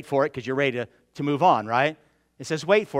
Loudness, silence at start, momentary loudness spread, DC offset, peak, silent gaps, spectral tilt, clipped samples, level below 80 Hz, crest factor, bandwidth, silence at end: -24 LUFS; 0 s; 12 LU; under 0.1%; -6 dBFS; none; -5.5 dB/octave; under 0.1%; -68 dBFS; 18 dB; 13.5 kHz; 0 s